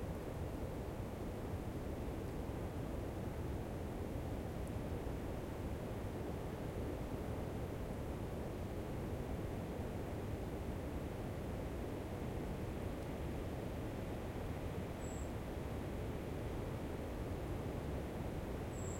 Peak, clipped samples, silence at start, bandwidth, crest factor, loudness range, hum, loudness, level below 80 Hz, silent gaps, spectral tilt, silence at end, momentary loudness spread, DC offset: -30 dBFS; under 0.1%; 0 s; 16.5 kHz; 12 dB; 0 LU; none; -45 LUFS; -50 dBFS; none; -7 dB/octave; 0 s; 1 LU; under 0.1%